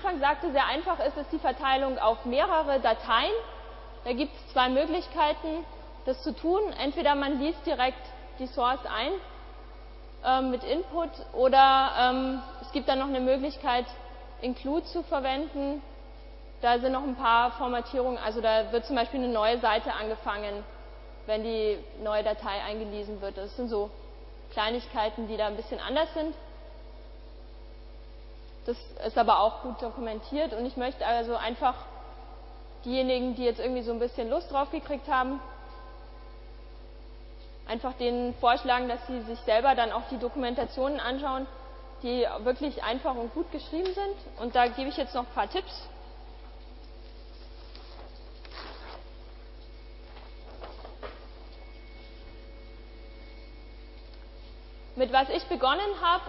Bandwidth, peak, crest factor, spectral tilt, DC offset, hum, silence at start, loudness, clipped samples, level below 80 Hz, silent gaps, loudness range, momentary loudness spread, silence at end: 5.8 kHz; -8 dBFS; 22 dB; -8 dB/octave; under 0.1%; none; 0 s; -29 LUFS; under 0.1%; -46 dBFS; none; 20 LU; 23 LU; 0 s